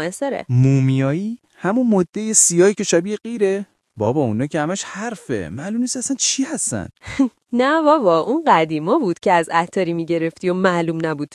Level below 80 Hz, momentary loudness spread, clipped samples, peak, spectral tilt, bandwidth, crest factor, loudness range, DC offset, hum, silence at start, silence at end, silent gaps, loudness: -58 dBFS; 11 LU; under 0.1%; 0 dBFS; -4.5 dB/octave; 12 kHz; 18 dB; 5 LU; under 0.1%; none; 0 s; 0.1 s; none; -18 LUFS